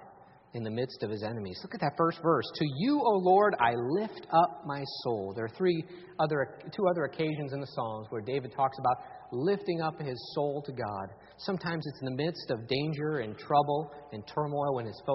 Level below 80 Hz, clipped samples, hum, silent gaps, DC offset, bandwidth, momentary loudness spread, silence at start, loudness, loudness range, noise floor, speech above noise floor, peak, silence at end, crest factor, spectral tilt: -68 dBFS; under 0.1%; none; none; under 0.1%; 5.8 kHz; 11 LU; 0 s; -31 LUFS; 6 LU; -55 dBFS; 25 dB; -10 dBFS; 0 s; 20 dB; -5 dB/octave